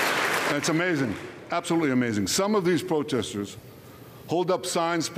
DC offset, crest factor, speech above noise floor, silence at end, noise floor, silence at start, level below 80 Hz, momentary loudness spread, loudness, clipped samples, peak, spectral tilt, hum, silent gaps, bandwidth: under 0.1%; 12 dB; 20 dB; 0 s; -46 dBFS; 0 s; -62 dBFS; 12 LU; -25 LUFS; under 0.1%; -14 dBFS; -4 dB/octave; none; none; 15.5 kHz